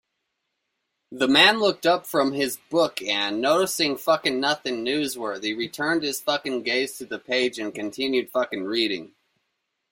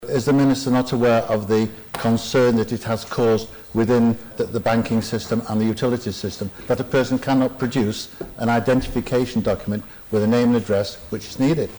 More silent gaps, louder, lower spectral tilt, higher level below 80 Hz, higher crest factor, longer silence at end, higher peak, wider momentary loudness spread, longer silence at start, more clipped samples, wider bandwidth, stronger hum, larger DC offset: neither; about the same, -23 LUFS vs -21 LUFS; second, -3 dB/octave vs -6.5 dB/octave; second, -68 dBFS vs -44 dBFS; first, 22 dB vs 10 dB; first, 0.85 s vs 0 s; first, -2 dBFS vs -12 dBFS; about the same, 8 LU vs 9 LU; first, 1.1 s vs 0 s; neither; second, 16.5 kHz vs over 20 kHz; neither; neither